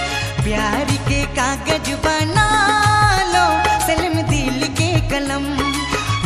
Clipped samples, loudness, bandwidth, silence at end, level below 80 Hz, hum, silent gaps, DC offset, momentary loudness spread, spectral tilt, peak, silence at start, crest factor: under 0.1%; -17 LUFS; 15 kHz; 0 s; -30 dBFS; none; none; under 0.1%; 6 LU; -4 dB/octave; -2 dBFS; 0 s; 16 dB